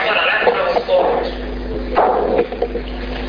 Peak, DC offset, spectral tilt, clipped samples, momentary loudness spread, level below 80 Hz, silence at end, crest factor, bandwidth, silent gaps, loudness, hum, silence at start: -2 dBFS; under 0.1%; -6.5 dB/octave; under 0.1%; 11 LU; -30 dBFS; 0 s; 16 dB; 5.2 kHz; none; -17 LUFS; none; 0 s